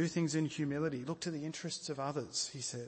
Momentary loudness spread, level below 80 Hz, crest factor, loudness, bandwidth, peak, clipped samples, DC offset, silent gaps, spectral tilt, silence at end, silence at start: 6 LU; -72 dBFS; 14 dB; -38 LUFS; 8.8 kHz; -22 dBFS; under 0.1%; under 0.1%; none; -4.5 dB/octave; 0 s; 0 s